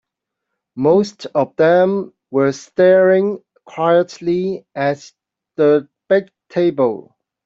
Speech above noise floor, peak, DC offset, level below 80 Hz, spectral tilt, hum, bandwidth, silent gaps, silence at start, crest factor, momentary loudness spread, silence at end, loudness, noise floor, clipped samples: 64 dB; -2 dBFS; under 0.1%; -62 dBFS; -7 dB/octave; none; 7.6 kHz; none; 0.75 s; 14 dB; 12 LU; 0.45 s; -16 LUFS; -80 dBFS; under 0.1%